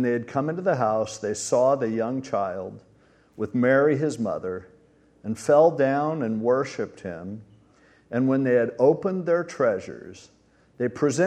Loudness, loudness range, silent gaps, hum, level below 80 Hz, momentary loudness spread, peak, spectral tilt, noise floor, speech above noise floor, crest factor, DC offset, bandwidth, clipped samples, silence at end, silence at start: -24 LUFS; 3 LU; none; none; -66 dBFS; 16 LU; -6 dBFS; -6 dB/octave; -58 dBFS; 34 dB; 18 dB; under 0.1%; 12 kHz; under 0.1%; 0 s; 0 s